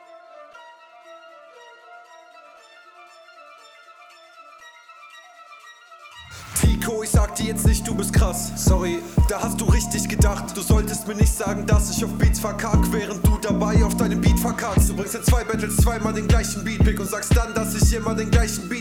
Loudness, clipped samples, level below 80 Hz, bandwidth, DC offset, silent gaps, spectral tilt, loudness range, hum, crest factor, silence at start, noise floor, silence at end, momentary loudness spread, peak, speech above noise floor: -21 LUFS; under 0.1%; -26 dBFS; 17.5 kHz; under 0.1%; none; -5.5 dB/octave; 4 LU; none; 16 dB; 0.1 s; -48 dBFS; 0 s; 4 LU; -4 dBFS; 28 dB